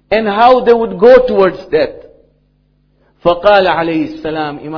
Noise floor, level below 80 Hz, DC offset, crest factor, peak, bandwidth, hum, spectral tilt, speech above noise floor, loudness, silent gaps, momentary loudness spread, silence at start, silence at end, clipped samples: -55 dBFS; -40 dBFS; under 0.1%; 12 dB; 0 dBFS; 5.4 kHz; 50 Hz at -50 dBFS; -7 dB/octave; 45 dB; -11 LUFS; none; 12 LU; 0.1 s; 0 s; 2%